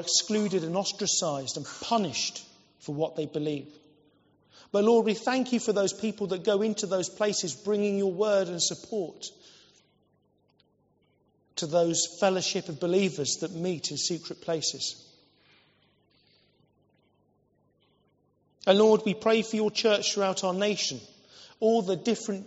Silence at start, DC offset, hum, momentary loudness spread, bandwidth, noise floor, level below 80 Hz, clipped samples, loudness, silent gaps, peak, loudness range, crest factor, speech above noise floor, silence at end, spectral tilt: 0 s; under 0.1%; 50 Hz at -65 dBFS; 10 LU; 8 kHz; -69 dBFS; -76 dBFS; under 0.1%; -27 LUFS; none; -8 dBFS; 8 LU; 22 dB; 42 dB; 0 s; -3.5 dB/octave